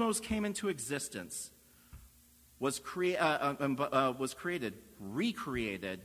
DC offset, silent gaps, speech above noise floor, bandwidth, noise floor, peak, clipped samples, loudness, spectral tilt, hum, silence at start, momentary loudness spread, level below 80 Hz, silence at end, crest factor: under 0.1%; none; 27 dB; 16 kHz; -63 dBFS; -14 dBFS; under 0.1%; -35 LUFS; -4 dB/octave; none; 0 s; 11 LU; -60 dBFS; 0 s; 22 dB